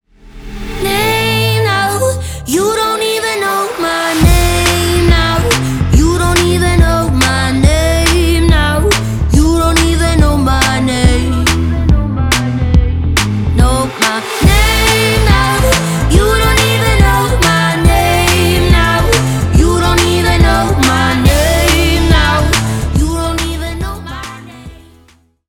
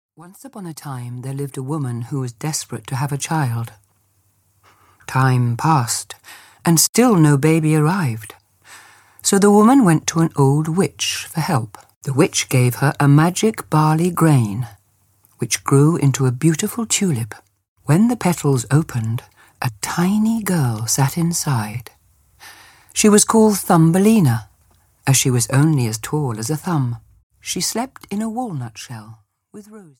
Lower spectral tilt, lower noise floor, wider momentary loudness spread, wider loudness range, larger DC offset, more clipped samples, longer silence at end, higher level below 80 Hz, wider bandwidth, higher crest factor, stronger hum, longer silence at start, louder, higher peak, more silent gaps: about the same, -4.5 dB/octave vs -5.5 dB/octave; second, -47 dBFS vs -61 dBFS; second, 5 LU vs 16 LU; second, 3 LU vs 8 LU; neither; neither; first, 0.75 s vs 0.2 s; first, -16 dBFS vs -54 dBFS; about the same, 18.5 kHz vs 17.5 kHz; second, 10 dB vs 18 dB; neither; about the same, 0.25 s vs 0.2 s; first, -11 LUFS vs -17 LUFS; about the same, 0 dBFS vs -2 dBFS; second, none vs 6.89-6.93 s, 11.96-12.01 s, 17.68-17.76 s, 27.23-27.30 s